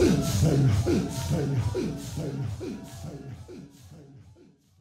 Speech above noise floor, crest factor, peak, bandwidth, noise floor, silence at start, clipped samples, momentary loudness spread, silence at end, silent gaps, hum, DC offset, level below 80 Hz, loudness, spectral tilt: 29 dB; 16 dB; -12 dBFS; 16 kHz; -56 dBFS; 0 s; under 0.1%; 20 LU; 0.6 s; none; none; under 0.1%; -44 dBFS; -27 LUFS; -6.5 dB/octave